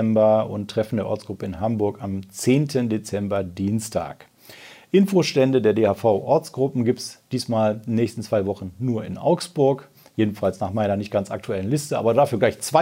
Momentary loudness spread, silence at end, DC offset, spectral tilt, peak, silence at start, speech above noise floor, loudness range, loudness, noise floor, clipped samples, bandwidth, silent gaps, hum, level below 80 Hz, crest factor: 10 LU; 0 s; under 0.1%; -6.5 dB/octave; -4 dBFS; 0 s; 24 dB; 3 LU; -22 LUFS; -45 dBFS; under 0.1%; 16 kHz; none; none; -62 dBFS; 18 dB